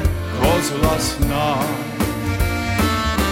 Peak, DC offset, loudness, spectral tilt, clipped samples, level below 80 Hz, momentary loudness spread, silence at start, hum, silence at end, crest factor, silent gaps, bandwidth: -4 dBFS; under 0.1%; -19 LUFS; -5 dB/octave; under 0.1%; -26 dBFS; 5 LU; 0 s; none; 0 s; 16 dB; none; 17 kHz